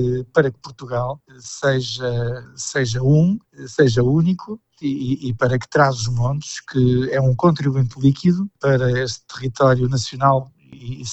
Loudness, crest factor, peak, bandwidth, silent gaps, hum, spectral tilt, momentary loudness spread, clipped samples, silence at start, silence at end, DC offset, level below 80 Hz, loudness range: -19 LUFS; 18 dB; -2 dBFS; 8.2 kHz; none; none; -6.5 dB/octave; 11 LU; under 0.1%; 0 s; 0 s; under 0.1%; -42 dBFS; 2 LU